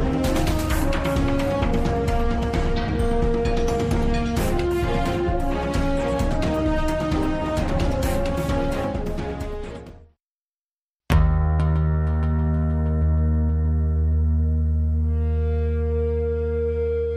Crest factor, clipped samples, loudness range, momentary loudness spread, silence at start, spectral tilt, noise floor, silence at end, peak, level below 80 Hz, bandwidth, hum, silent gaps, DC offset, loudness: 18 dB; under 0.1%; 4 LU; 3 LU; 0 s; -7 dB/octave; under -90 dBFS; 0 s; -4 dBFS; -24 dBFS; 15 kHz; none; 10.26-10.99 s; under 0.1%; -23 LUFS